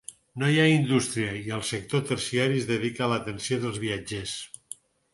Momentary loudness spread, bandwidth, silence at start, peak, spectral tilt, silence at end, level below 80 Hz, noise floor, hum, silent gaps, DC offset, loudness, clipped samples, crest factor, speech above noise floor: 16 LU; 11.5 kHz; 0.1 s; -8 dBFS; -5 dB/octave; 0.4 s; -58 dBFS; -47 dBFS; none; none; under 0.1%; -27 LUFS; under 0.1%; 20 dB; 21 dB